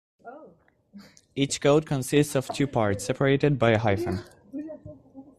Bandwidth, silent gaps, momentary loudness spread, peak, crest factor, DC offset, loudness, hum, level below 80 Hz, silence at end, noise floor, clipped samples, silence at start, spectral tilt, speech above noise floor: 14 kHz; none; 19 LU; -8 dBFS; 18 dB; under 0.1%; -24 LUFS; none; -56 dBFS; 0.15 s; -57 dBFS; under 0.1%; 0.25 s; -5.5 dB/octave; 33 dB